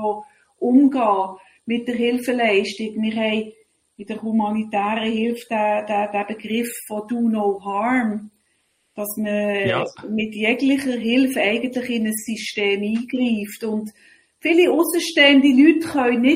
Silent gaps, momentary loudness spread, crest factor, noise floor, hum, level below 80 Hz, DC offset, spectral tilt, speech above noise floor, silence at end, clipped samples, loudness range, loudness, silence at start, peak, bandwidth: none; 11 LU; 20 dB; -67 dBFS; none; -64 dBFS; under 0.1%; -4.5 dB/octave; 47 dB; 0 s; under 0.1%; 6 LU; -20 LUFS; 0 s; 0 dBFS; 16 kHz